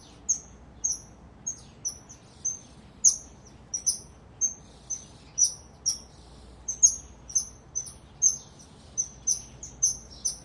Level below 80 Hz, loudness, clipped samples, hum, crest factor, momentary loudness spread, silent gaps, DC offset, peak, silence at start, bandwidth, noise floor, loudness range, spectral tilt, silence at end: -54 dBFS; -27 LUFS; under 0.1%; none; 26 dB; 15 LU; none; under 0.1%; -6 dBFS; 0.1 s; 11.5 kHz; -50 dBFS; 3 LU; 0 dB/octave; 0 s